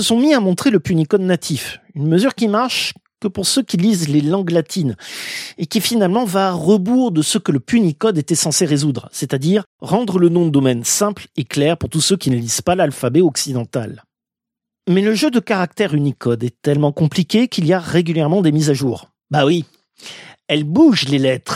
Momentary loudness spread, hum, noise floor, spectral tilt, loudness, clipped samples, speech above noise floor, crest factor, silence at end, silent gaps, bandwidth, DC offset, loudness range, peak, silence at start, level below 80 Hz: 9 LU; none; -85 dBFS; -5 dB/octave; -16 LUFS; under 0.1%; 69 dB; 14 dB; 0 s; 9.66-9.79 s; 16 kHz; under 0.1%; 2 LU; -2 dBFS; 0 s; -52 dBFS